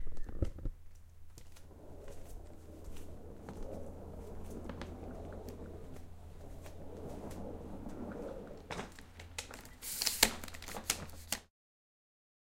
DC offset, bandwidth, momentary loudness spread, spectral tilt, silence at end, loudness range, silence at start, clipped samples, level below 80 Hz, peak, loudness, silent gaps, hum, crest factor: under 0.1%; 16.5 kHz; 17 LU; -2.5 dB/octave; 1.05 s; 14 LU; 0 s; under 0.1%; -50 dBFS; -6 dBFS; -41 LUFS; none; none; 36 dB